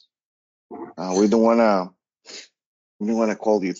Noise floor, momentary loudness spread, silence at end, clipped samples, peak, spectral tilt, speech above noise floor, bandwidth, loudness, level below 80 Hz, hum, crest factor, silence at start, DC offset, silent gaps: -43 dBFS; 23 LU; 0.05 s; under 0.1%; -4 dBFS; -5.5 dB/octave; 24 dB; 7.8 kHz; -20 LUFS; -64 dBFS; none; 18 dB; 0.7 s; under 0.1%; 2.66-2.99 s